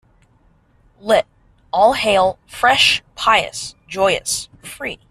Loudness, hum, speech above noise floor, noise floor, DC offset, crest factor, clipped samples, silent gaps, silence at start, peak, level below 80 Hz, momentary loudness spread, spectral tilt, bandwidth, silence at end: -16 LUFS; none; 38 dB; -55 dBFS; under 0.1%; 18 dB; under 0.1%; none; 1.05 s; 0 dBFS; -48 dBFS; 16 LU; -1.5 dB/octave; 14 kHz; 0.15 s